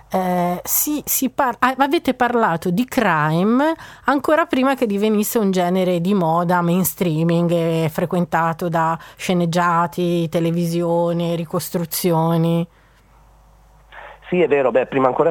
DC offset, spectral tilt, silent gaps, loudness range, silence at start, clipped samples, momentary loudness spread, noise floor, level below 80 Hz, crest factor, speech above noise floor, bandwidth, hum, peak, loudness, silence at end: under 0.1%; -5.5 dB/octave; none; 3 LU; 0.1 s; under 0.1%; 5 LU; -51 dBFS; -52 dBFS; 16 dB; 33 dB; 19 kHz; none; -2 dBFS; -18 LUFS; 0 s